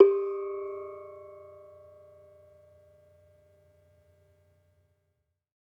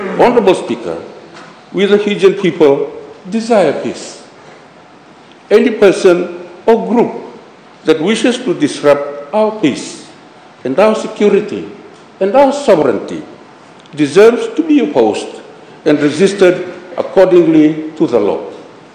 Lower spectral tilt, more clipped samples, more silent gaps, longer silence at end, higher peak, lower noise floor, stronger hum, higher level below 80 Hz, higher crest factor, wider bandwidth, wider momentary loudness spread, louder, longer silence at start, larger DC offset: first, -9 dB/octave vs -5.5 dB/octave; second, under 0.1% vs 1%; neither; first, 4.2 s vs 0.25 s; second, -6 dBFS vs 0 dBFS; first, -79 dBFS vs -39 dBFS; neither; second, -82 dBFS vs -54 dBFS; first, 26 dB vs 12 dB; second, 2.7 kHz vs 10 kHz; first, 24 LU vs 16 LU; second, -31 LUFS vs -12 LUFS; about the same, 0 s vs 0 s; neither